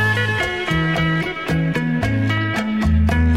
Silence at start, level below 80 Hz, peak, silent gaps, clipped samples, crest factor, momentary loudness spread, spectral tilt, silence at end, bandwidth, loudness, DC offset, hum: 0 s; -26 dBFS; -6 dBFS; none; under 0.1%; 12 dB; 3 LU; -6.5 dB/octave; 0 s; 14.5 kHz; -19 LUFS; 0.4%; none